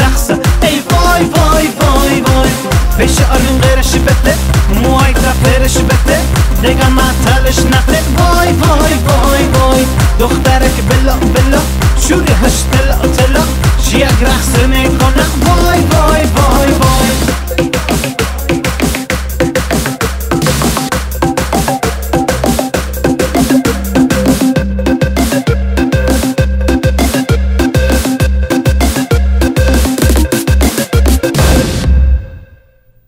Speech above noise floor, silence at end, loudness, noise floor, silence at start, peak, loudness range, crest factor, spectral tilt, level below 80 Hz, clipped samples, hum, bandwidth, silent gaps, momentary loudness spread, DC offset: 37 dB; 0.65 s; -10 LUFS; -45 dBFS; 0 s; 0 dBFS; 4 LU; 10 dB; -5 dB/octave; -14 dBFS; under 0.1%; none; 16.5 kHz; none; 5 LU; under 0.1%